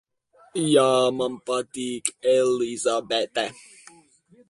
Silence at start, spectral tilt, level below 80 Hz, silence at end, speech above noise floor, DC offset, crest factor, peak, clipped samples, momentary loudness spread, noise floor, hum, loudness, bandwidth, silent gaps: 0.55 s; -3.5 dB/octave; -68 dBFS; 1 s; 35 dB; under 0.1%; 22 dB; -2 dBFS; under 0.1%; 10 LU; -58 dBFS; none; -23 LUFS; 11.5 kHz; none